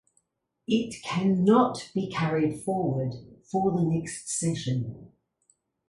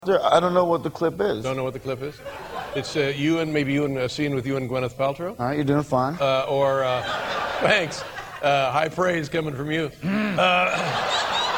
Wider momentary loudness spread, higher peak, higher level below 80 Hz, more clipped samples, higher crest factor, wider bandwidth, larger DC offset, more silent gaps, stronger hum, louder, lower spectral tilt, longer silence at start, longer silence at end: about the same, 11 LU vs 10 LU; second, -8 dBFS vs -4 dBFS; second, -60 dBFS vs -54 dBFS; neither; about the same, 20 dB vs 20 dB; second, 11.5 kHz vs 17 kHz; neither; neither; neither; second, -27 LUFS vs -23 LUFS; about the same, -6 dB/octave vs -5 dB/octave; first, 0.7 s vs 0 s; first, 0.8 s vs 0 s